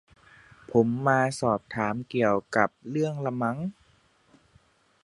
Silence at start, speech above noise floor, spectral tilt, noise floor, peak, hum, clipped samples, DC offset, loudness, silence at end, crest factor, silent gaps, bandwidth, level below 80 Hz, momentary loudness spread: 0.7 s; 37 dB; -6.5 dB/octave; -63 dBFS; -6 dBFS; none; under 0.1%; under 0.1%; -27 LUFS; 1.3 s; 22 dB; none; 11.5 kHz; -62 dBFS; 6 LU